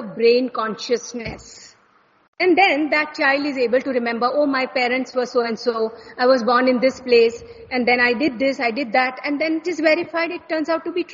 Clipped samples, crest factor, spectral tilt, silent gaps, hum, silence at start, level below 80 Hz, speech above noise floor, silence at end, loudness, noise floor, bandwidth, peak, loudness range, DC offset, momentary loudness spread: under 0.1%; 18 dB; -1.5 dB/octave; 2.28-2.33 s; none; 0 s; -58 dBFS; 38 dB; 0 s; -19 LUFS; -57 dBFS; 7.6 kHz; -2 dBFS; 2 LU; under 0.1%; 8 LU